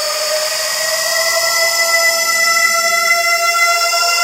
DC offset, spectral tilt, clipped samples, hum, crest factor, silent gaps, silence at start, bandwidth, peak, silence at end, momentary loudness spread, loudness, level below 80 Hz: under 0.1%; 2.5 dB/octave; under 0.1%; none; 14 dB; none; 0 s; 16 kHz; 0 dBFS; 0 s; 4 LU; -12 LUFS; -56 dBFS